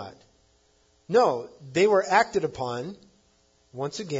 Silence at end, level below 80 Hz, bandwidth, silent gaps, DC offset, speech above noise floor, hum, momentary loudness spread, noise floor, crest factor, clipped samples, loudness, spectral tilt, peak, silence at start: 0 s; -64 dBFS; 7.8 kHz; none; under 0.1%; 40 dB; none; 16 LU; -64 dBFS; 22 dB; under 0.1%; -25 LUFS; -5 dB/octave; -6 dBFS; 0 s